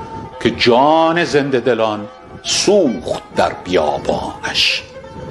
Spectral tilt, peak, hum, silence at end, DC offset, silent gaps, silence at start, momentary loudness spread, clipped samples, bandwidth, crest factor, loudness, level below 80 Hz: -3.5 dB/octave; 0 dBFS; none; 0 s; under 0.1%; none; 0 s; 14 LU; under 0.1%; 12.5 kHz; 16 dB; -15 LUFS; -44 dBFS